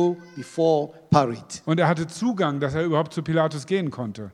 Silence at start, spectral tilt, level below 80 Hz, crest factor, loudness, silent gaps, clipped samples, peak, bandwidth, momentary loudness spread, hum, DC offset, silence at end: 0 s; -6.5 dB/octave; -58 dBFS; 22 dB; -24 LUFS; none; under 0.1%; -2 dBFS; 11.5 kHz; 9 LU; none; under 0.1%; 0 s